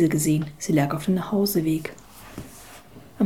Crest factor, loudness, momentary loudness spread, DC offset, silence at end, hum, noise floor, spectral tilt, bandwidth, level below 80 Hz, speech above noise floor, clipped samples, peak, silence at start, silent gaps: 16 dB; -23 LUFS; 22 LU; 0.3%; 0 s; none; -46 dBFS; -6 dB/octave; 19 kHz; -54 dBFS; 24 dB; under 0.1%; -8 dBFS; 0 s; none